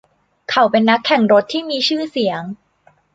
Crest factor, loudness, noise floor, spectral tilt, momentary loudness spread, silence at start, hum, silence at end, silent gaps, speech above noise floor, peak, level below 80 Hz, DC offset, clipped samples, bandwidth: 16 dB; -16 LUFS; -56 dBFS; -5 dB/octave; 17 LU; 0.5 s; none; 0.6 s; none; 40 dB; -2 dBFS; -62 dBFS; under 0.1%; under 0.1%; 7.8 kHz